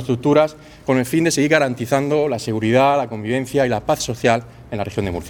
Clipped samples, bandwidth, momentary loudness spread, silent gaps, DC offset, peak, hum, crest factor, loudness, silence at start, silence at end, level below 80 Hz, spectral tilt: under 0.1%; 19.5 kHz; 8 LU; none; under 0.1%; 0 dBFS; none; 18 dB; -18 LUFS; 0 s; 0 s; -46 dBFS; -5.5 dB/octave